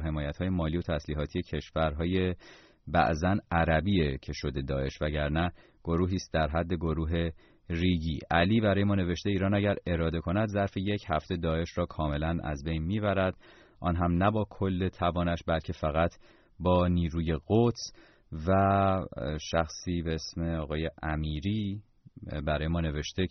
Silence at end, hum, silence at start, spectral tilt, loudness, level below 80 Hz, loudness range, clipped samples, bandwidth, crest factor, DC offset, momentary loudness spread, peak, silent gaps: 0 s; none; 0 s; -6 dB/octave; -30 LUFS; -42 dBFS; 3 LU; under 0.1%; 6.4 kHz; 18 dB; under 0.1%; 8 LU; -12 dBFS; none